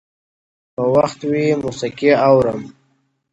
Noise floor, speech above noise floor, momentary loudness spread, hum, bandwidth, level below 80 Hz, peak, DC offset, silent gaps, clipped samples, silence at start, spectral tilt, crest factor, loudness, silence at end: -64 dBFS; 48 dB; 11 LU; none; 8.2 kHz; -52 dBFS; 0 dBFS; under 0.1%; none; under 0.1%; 0.8 s; -6.5 dB/octave; 18 dB; -16 LUFS; 0.6 s